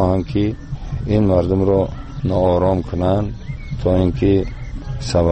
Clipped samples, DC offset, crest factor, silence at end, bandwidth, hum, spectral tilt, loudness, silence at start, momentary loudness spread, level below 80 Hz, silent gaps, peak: under 0.1%; under 0.1%; 14 dB; 0 s; 8.6 kHz; none; -8 dB/octave; -18 LUFS; 0 s; 13 LU; -30 dBFS; none; -4 dBFS